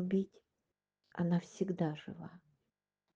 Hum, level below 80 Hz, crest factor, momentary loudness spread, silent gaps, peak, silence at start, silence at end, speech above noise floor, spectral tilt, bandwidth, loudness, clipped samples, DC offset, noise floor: 50 Hz at -65 dBFS; -78 dBFS; 18 dB; 15 LU; none; -22 dBFS; 0 s; 0.8 s; 52 dB; -8 dB/octave; 7.6 kHz; -38 LUFS; under 0.1%; under 0.1%; -89 dBFS